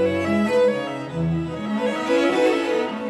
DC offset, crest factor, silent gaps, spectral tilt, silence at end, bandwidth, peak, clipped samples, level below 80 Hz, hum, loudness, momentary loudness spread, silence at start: under 0.1%; 14 dB; none; -6.5 dB/octave; 0 s; 12.5 kHz; -8 dBFS; under 0.1%; -52 dBFS; none; -21 LUFS; 8 LU; 0 s